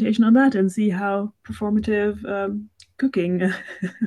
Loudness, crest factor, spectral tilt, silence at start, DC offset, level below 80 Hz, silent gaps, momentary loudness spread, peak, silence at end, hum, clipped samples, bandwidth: -21 LUFS; 16 dB; -7.5 dB/octave; 0 s; under 0.1%; -50 dBFS; none; 13 LU; -6 dBFS; 0 s; none; under 0.1%; 11.5 kHz